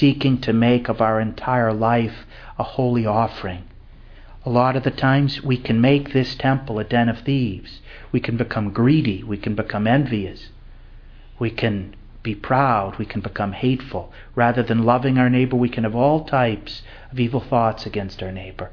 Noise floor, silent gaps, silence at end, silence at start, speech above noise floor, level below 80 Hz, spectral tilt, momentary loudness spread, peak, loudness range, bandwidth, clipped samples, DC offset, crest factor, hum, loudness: -42 dBFS; none; 0 s; 0 s; 22 dB; -42 dBFS; -9 dB/octave; 14 LU; -2 dBFS; 4 LU; 5.4 kHz; under 0.1%; under 0.1%; 18 dB; none; -20 LUFS